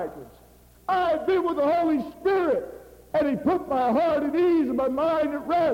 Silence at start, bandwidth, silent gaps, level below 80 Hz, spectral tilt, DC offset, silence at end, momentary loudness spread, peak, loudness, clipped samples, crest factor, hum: 0 s; 17 kHz; none; -56 dBFS; -7 dB/octave; under 0.1%; 0 s; 7 LU; -12 dBFS; -24 LUFS; under 0.1%; 12 dB; none